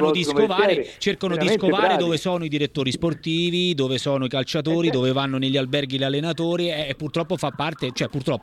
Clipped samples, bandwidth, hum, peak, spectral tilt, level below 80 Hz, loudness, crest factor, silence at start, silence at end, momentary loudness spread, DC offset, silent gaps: under 0.1%; 14 kHz; none; -6 dBFS; -5.5 dB/octave; -54 dBFS; -22 LUFS; 16 dB; 0 s; 0.05 s; 7 LU; under 0.1%; none